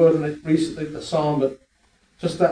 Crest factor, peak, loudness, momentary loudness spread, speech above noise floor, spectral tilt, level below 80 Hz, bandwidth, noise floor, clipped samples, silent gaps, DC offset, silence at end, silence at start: 16 dB; -4 dBFS; -23 LUFS; 9 LU; 41 dB; -7 dB/octave; -54 dBFS; 10.5 kHz; -62 dBFS; under 0.1%; none; under 0.1%; 0 s; 0 s